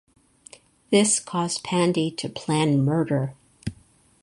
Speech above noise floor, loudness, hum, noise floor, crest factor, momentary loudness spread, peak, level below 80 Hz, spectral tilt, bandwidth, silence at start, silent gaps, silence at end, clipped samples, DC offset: 34 dB; -23 LUFS; none; -56 dBFS; 20 dB; 17 LU; -6 dBFS; -56 dBFS; -4.5 dB/octave; 11.5 kHz; 0.9 s; none; 0.5 s; under 0.1%; under 0.1%